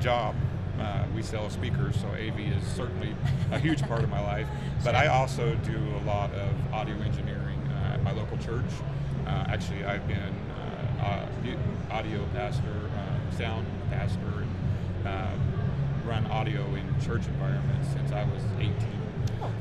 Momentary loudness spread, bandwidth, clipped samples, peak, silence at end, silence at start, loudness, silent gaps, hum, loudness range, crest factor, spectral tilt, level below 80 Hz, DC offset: 5 LU; 11 kHz; under 0.1%; -8 dBFS; 0 s; 0 s; -30 LUFS; none; none; 4 LU; 20 dB; -7 dB/octave; -42 dBFS; under 0.1%